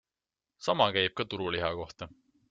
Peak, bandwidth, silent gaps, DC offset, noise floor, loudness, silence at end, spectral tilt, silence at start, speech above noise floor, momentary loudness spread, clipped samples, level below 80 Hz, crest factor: -8 dBFS; 8 kHz; none; under 0.1%; under -90 dBFS; -30 LUFS; 0.4 s; -2 dB/octave; 0.6 s; over 59 dB; 17 LU; under 0.1%; -62 dBFS; 24 dB